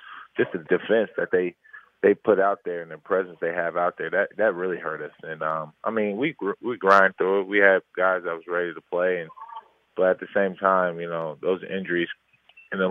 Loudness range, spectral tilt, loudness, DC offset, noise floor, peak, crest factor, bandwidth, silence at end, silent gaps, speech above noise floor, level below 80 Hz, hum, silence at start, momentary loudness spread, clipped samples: 5 LU; -7 dB/octave; -24 LUFS; under 0.1%; -45 dBFS; -2 dBFS; 22 dB; 7 kHz; 0 s; none; 21 dB; -74 dBFS; none; 0 s; 14 LU; under 0.1%